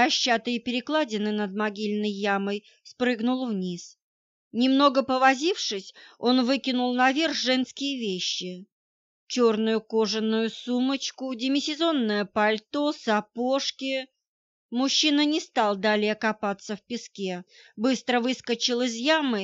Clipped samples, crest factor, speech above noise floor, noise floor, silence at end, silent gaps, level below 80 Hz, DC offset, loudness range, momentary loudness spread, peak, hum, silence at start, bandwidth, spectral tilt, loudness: under 0.1%; 20 dB; over 65 dB; under -90 dBFS; 0 s; 4.02-4.51 s, 8.72-9.27 s, 14.27-14.69 s; -74 dBFS; under 0.1%; 3 LU; 11 LU; -6 dBFS; none; 0 s; 8 kHz; -3.5 dB/octave; -25 LUFS